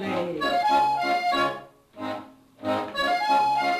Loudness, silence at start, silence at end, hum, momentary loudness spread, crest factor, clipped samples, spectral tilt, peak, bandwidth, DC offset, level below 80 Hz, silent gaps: -24 LUFS; 0 s; 0 s; none; 13 LU; 14 dB; under 0.1%; -4 dB/octave; -12 dBFS; 14 kHz; under 0.1%; -60 dBFS; none